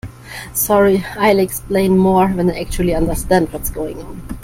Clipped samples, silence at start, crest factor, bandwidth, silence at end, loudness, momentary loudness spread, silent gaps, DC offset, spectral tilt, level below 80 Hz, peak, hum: under 0.1%; 0.05 s; 14 dB; 16.5 kHz; 0 s; -16 LUFS; 14 LU; none; under 0.1%; -5.5 dB/octave; -30 dBFS; 0 dBFS; none